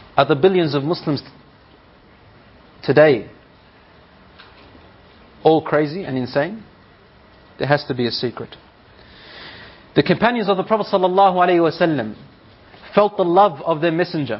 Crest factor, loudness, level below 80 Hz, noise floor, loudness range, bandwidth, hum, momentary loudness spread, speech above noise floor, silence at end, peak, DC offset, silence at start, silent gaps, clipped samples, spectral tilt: 20 dB; -18 LUFS; -56 dBFS; -49 dBFS; 7 LU; 5.8 kHz; none; 16 LU; 32 dB; 0 s; 0 dBFS; under 0.1%; 0.15 s; none; under 0.1%; -4.5 dB/octave